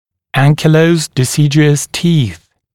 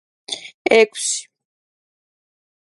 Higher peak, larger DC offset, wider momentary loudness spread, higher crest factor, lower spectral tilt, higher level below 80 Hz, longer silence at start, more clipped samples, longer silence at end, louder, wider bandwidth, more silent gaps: about the same, 0 dBFS vs 0 dBFS; neither; second, 5 LU vs 15 LU; second, 12 dB vs 22 dB; first, -5.5 dB/octave vs -1 dB/octave; first, -46 dBFS vs -72 dBFS; about the same, 0.35 s vs 0.3 s; neither; second, 0.4 s vs 1.55 s; first, -12 LUFS vs -17 LUFS; first, 15 kHz vs 11.5 kHz; second, none vs 0.54-0.65 s